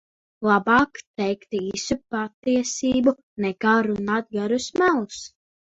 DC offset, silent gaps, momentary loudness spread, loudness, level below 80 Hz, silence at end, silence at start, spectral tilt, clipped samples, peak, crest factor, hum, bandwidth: under 0.1%; 1.07-1.14 s, 2.34-2.43 s, 3.23-3.36 s; 9 LU; -23 LUFS; -54 dBFS; 0.4 s; 0.4 s; -4.5 dB/octave; under 0.1%; -6 dBFS; 18 dB; none; 8 kHz